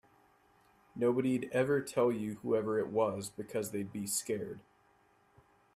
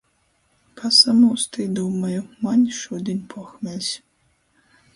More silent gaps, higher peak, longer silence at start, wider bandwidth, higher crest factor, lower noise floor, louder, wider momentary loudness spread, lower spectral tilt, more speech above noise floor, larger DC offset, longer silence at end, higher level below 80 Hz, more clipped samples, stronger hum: neither; second, -18 dBFS vs 0 dBFS; first, 0.95 s vs 0.75 s; first, 15.5 kHz vs 11.5 kHz; about the same, 18 dB vs 22 dB; first, -69 dBFS vs -65 dBFS; second, -34 LUFS vs -19 LUFS; second, 8 LU vs 18 LU; about the same, -5 dB/octave vs -4 dB/octave; second, 35 dB vs 45 dB; neither; first, 1.15 s vs 1 s; second, -72 dBFS vs -64 dBFS; neither; neither